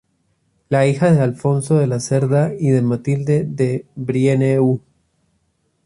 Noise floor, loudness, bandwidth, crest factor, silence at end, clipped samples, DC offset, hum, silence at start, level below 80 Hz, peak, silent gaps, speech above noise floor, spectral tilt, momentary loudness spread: -65 dBFS; -17 LUFS; 11.5 kHz; 14 dB; 1.05 s; under 0.1%; under 0.1%; none; 0.7 s; -54 dBFS; -2 dBFS; none; 49 dB; -7.5 dB/octave; 6 LU